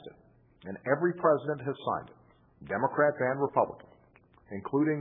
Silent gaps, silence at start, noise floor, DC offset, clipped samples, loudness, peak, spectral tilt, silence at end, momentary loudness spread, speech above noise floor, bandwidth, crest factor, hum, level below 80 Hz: none; 0 s; -61 dBFS; under 0.1%; under 0.1%; -30 LUFS; -10 dBFS; -11 dB/octave; 0 s; 16 LU; 32 dB; 3.8 kHz; 20 dB; none; -70 dBFS